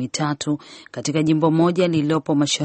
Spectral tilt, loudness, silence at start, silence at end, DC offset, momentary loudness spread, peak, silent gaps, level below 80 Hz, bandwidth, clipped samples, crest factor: -5.5 dB/octave; -20 LUFS; 0 s; 0 s; under 0.1%; 10 LU; -4 dBFS; none; -60 dBFS; 8.8 kHz; under 0.1%; 16 dB